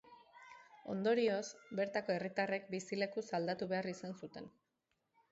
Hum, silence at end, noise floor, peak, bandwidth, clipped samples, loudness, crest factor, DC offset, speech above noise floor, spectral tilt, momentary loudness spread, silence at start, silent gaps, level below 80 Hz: none; 0.85 s; -85 dBFS; -22 dBFS; 7.6 kHz; under 0.1%; -39 LUFS; 18 dB; under 0.1%; 46 dB; -4 dB/octave; 21 LU; 0.1 s; none; -82 dBFS